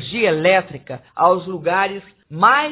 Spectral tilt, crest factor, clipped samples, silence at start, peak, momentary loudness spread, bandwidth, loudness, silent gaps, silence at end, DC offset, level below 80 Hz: -8.5 dB/octave; 18 dB; under 0.1%; 0 s; 0 dBFS; 18 LU; 4 kHz; -17 LUFS; none; 0 s; under 0.1%; -58 dBFS